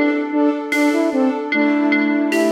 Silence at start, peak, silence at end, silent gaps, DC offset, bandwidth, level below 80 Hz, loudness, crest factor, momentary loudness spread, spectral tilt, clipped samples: 0 s; -6 dBFS; 0 s; none; under 0.1%; 15 kHz; -72 dBFS; -17 LUFS; 12 dB; 2 LU; -4 dB/octave; under 0.1%